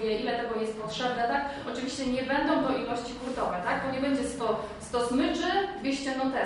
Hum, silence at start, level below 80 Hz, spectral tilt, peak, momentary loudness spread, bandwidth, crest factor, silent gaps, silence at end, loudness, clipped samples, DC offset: none; 0 s; -54 dBFS; -4.5 dB/octave; -14 dBFS; 7 LU; 11 kHz; 16 dB; none; 0 s; -30 LUFS; under 0.1%; under 0.1%